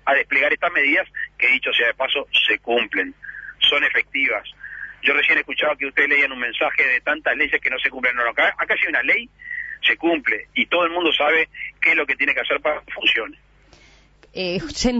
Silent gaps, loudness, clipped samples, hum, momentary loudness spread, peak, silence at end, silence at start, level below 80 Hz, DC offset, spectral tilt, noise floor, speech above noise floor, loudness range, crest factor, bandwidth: none; -18 LUFS; under 0.1%; 50 Hz at -55 dBFS; 9 LU; -4 dBFS; 0 s; 0.05 s; -50 dBFS; under 0.1%; -2.5 dB/octave; -51 dBFS; 31 dB; 1 LU; 16 dB; 8 kHz